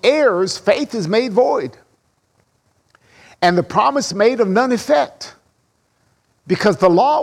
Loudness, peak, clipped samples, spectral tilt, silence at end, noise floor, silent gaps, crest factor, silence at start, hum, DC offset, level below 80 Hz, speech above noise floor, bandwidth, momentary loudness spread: -16 LUFS; -2 dBFS; under 0.1%; -5 dB/octave; 0 s; -63 dBFS; none; 16 dB; 0.05 s; none; under 0.1%; -58 dBFS; 48 dB; 14 kHz; 9 LU